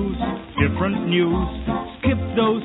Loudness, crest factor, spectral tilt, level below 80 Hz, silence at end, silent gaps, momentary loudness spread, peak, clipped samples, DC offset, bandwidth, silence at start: -22 LUFS; 16 dB; -11.5 dB/octave; -34 dBFS; 0 s; none; 7 LU; -6 dBFS; under 0.1%; under 0.1%; 4.1 kHz; 0 s